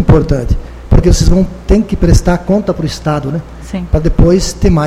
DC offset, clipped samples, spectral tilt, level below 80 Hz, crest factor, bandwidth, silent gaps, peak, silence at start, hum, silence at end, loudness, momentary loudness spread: under 0.1%; 0.3%; -6.5 dB/octave; -14 dBFS; 10 dB; 14.5 kHz; none; 0 dBFS; 0 s; none; 0 s; -12 LUFS; 10 LU